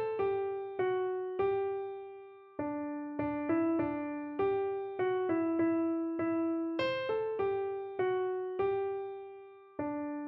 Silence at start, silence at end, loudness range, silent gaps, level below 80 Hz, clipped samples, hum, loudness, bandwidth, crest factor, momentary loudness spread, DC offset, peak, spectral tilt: 0 s; 0 s; 3 LU; none; -68 dBFS; under 0.1%; none; -34 LUFS; 5.8 kHz; 14 dB; 10 LU; under 0.1%; -20 dBFS; -5 dB/octave